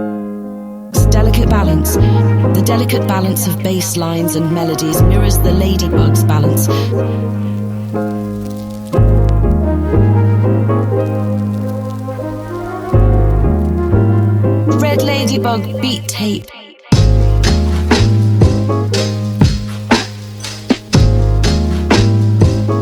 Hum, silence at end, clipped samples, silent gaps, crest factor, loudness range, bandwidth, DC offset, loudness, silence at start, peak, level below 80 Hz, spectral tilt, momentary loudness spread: none; 0 s; under 0.1%; none; 12 dB; 3 LU; 15.5 kHz; under 0.1%; -14 LUFS; 0 s; 0 dBFS; -20 dBFS; -6 dB/octave; 10 LU